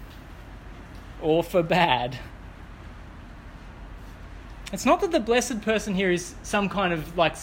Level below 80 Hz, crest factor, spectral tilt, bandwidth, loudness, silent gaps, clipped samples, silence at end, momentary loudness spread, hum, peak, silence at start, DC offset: -44 dBFS; 20 dB; -4.5 dB/octave; 17 kHz; -24 LUFS; none; under 0.1%; 0 s; 22 LU; none; -6 dBFS; 0 s; under 0.1%